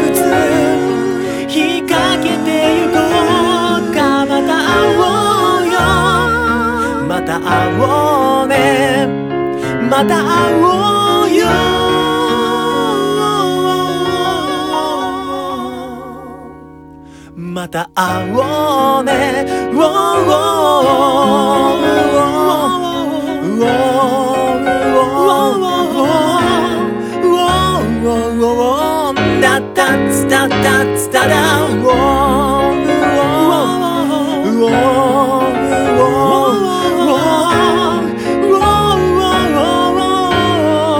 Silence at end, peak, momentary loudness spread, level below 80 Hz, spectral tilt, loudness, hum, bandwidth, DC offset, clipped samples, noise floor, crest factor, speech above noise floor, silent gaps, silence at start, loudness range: 0 s; 0 dBFS; 6 LU; -36 dBFS; -4.5 dB/octave; -12 LUFS; none; 18.5 kHz; under 0.1%; under 0.1%; -35 dBFS; 12 dB; 24 dB; none; 0 s; 4 LU